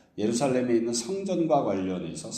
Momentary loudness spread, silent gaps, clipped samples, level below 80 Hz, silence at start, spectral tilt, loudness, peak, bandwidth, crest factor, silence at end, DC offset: 6 LU; none; under 0.1%; -64 dBFS; 0.15 s; -5 dB/octave; -27 LUFS; -12 dBFS; 14.5 kHz; 16 dB; 0 s; under 0.1%